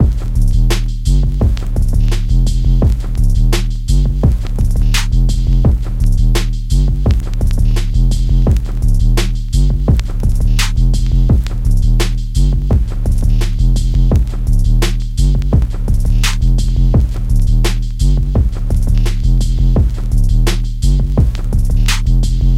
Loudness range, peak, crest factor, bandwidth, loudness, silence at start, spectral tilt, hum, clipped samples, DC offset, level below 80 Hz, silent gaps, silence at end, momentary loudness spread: 0 LU; 0 dBFS; 10 dB; 13 kHz; -15 LUFS; 0 s; -6 dB/octave; none; under 0.1%; under 0.1%; -12 dBFS; none; 0 s; 3 LU